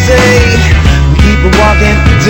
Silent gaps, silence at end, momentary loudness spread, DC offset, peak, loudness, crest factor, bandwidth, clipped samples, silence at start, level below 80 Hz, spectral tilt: none; 0 s; 2 LU; under 0.1%; 0 dBFS; -6 LUFS; 6 dB; 16.5 kHz; 3%; 0 s; -10 dBFS; -5.5 dB/octave